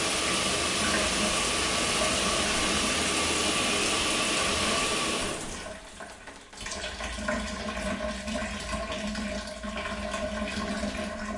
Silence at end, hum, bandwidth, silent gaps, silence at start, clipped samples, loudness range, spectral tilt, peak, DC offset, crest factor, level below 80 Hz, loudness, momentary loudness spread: 0 s; none; 11.5 kHz; none; 0 s; under 0.1%; 9 LU; -2 dB/octave; -14 dBFS; under 0.1%; 16 dB; -44 dBFS; -27 LUFS; 11 LU